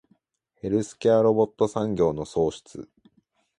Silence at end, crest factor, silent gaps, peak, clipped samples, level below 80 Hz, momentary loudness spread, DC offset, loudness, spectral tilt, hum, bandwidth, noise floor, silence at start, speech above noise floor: 0.75 s; 18 dB; none; -8 dBFS; under 0.1%; -54 dBFS; 19 LU; under 0.1%; -24 LUFS; -7 dB/octave; none; 11 kHz; -71 dBFS; 0.65 s; 47 dB